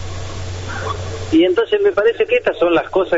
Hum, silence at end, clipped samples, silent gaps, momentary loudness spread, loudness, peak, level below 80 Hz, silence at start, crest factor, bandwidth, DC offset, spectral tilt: none; 0 s; under 0.1%; none; 13 LU; -16 LUFS; -4 dBFS; -38 dBFS; 0 s; 12 dB; 8 kHz; under 0.1%; -4.5 dB/octave